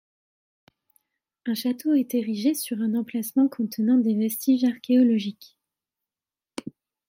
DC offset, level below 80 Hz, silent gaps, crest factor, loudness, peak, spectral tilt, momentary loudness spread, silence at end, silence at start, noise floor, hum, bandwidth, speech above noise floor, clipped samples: under 0.1%; -80 dBFS; none; 14 dB; -24 LUFS; -10 dBFS; -5.5 dB/octave; 16 LU; 0.4 s; 1.45 s; under -90 dBFS; none; 16.5 kHz; over 67 dB; under 0.1%